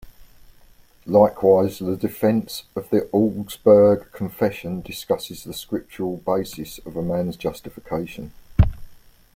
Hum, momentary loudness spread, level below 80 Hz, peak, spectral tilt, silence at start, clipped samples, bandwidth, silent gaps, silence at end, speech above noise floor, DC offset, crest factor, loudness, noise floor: none; 16 LU; -38 dBFS; -2 dBFS; -7 dB/octave; 0.05 s; under 0.1%; 16.5 kHz; none; 0.45 s; 30 dB; under 0.1%; 20 dB; -21 LUFS; -51 dBFS